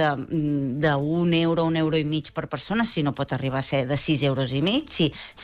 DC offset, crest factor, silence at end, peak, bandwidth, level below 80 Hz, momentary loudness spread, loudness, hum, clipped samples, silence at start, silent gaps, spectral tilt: under 0.1%; 14 dB; 0 s; -10 dBFS; 5.2 kHz; -52 dBFS; 6 LU; -24 LUFS; none; under 0.1%; 0 s; none; -9 dB/octave